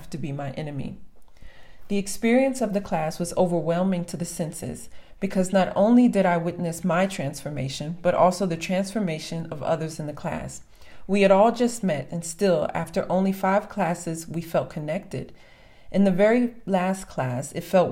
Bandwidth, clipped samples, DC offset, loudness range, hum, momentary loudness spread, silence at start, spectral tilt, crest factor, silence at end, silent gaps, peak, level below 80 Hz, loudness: 16 kHz; under 0.1%; under 0.1%; 4 LU; none; 13 LU; 0 s; -6 dB/octave; 18 dB; 0 s; none; -6 dBFS; -52 dBFS; -24 LUFS